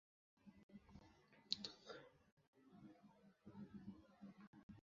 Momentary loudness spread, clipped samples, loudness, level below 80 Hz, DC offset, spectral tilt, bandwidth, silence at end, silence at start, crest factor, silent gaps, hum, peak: 20 LU; under 0.1%; -55 LUFS; -82 dBFS; under 0.1%; -3 dB/octave; 7.2 kHz; 0.05 s; 0.35 s; 38 dB; 0.63-0.69 s, 2.32-2.37 s, 2.48-2.53 s, 4.47-4.53 s, 4.63-4.69 s; none; -22 dBFS